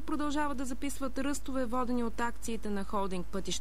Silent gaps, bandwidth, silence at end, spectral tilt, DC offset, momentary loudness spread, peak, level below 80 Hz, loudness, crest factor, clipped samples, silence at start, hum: none; 16 kHz; 0 s; -4.5 dB/octave; 2%; 4 LU; -18 dBFS; -48 dBFS; -35 LUFS; 16 dB; under 0.1%; 0 s; none